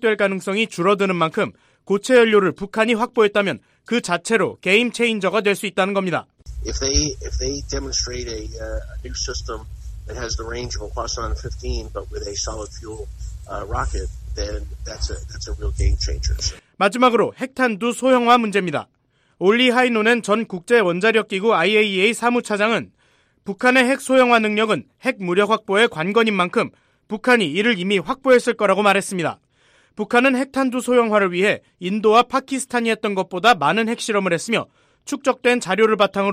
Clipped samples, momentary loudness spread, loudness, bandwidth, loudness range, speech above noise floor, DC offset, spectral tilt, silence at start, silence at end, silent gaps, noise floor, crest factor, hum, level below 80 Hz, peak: under 0.1%; 15 LU; -19 LUFS; 15 kHz; 10 LU; 41 dB; under 0.1%; -4 dB/octave; 0 s; 0 s; none; -60 dBFS; 16 dB; none; -34 dBFS; -4 dBFS